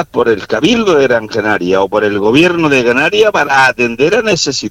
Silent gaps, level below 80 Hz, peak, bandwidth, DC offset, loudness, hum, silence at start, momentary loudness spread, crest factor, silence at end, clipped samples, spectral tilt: none; -44 dBFS; 0 dBFS; 16 kHz; under 0.1%; -11 LUFS; none; 0 s; 4 LU; 10 dB; 0 s; under 0.1%; -4 dB/octave